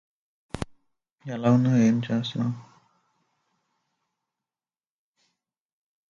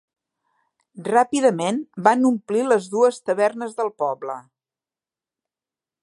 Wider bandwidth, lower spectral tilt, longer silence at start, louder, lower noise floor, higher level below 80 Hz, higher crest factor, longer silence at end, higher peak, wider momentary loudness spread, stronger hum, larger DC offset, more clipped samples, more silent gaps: about the same, 10.5 kHz vs 11.5 kHz; first, -7.5 dB/octave vs -5 dB/octave; second, 0.55 s vs 0.95 s; second, -24 LUFS vs -21 LUFS; about the same, under -90 dBFS vs under -90 dBFS; first, -58 dBFS vs -76 dBFS; about the same, 20 dB vs 22 dB; first, 3.5 s vs 1.6 s; second, -10 dBFS vs -2 dBFS; first, 20 LU vs 11 LU; neither; neither; neither; first, 1.12-1.18 s vs none